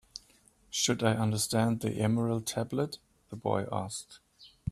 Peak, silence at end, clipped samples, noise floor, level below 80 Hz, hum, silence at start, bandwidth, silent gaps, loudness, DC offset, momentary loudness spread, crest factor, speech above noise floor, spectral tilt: -12 dBFS; 0 s; under 0.1%; -64 dBFS; -62 dBFS; none; 0.15 s; 15 kHz; none; -31 LUFS; under 0.1%; 19 LU; 20 dB; 33 dB; -4.5 dB/octave